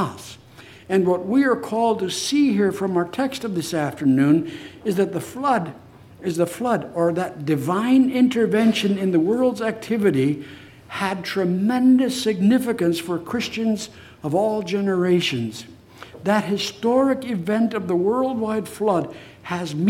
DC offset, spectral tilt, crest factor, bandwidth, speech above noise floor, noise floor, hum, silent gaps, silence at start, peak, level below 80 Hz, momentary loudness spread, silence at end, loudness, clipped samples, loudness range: under 0.1%; -6 dB/octave; 16 dB; 16 kHz; 25 dB; -45 dBFS; none; none; 0 s; -4 dBFS; -62 dBFS; 10 LU; 0 s; -21 LUFS; under 0.1%; 3 LU